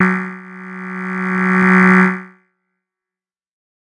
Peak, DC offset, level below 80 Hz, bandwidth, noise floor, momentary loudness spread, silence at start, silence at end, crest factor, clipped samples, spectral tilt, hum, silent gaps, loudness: 0 dBFS; under 0.1%; -60 dBFS; 8.4 kHz; under -90 dBFS; 20 LU; 0 s; 1.55 s; 16 dB; under 0.1%; -8 dB/octave; none; none; -14 LUFS